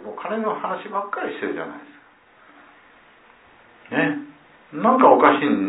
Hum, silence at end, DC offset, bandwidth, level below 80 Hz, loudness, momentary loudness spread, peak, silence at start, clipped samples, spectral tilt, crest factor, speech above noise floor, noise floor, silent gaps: none; 0 s; under 0.1%; 4 kHz; -70 dBFS; -20 LUFS; 18 LU; 0 dBFS; 0 s; under 0.1%; -9.5 dB/octave; 22 dB; 32 dB; -52 dBFS; none